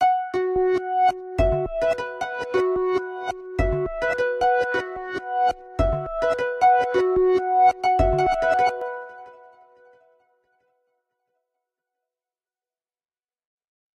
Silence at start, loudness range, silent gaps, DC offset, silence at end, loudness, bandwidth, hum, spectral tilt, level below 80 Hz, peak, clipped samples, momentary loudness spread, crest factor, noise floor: 0 s; 5 LU; none; under 0.1%; 4.6 s; -22 LUFS; 10 kHz; none; -6.5 dB/octave; -38 dBFS; -8 dBFS; under 0.1%; 11 LU; 16 dB; under -90 dBFS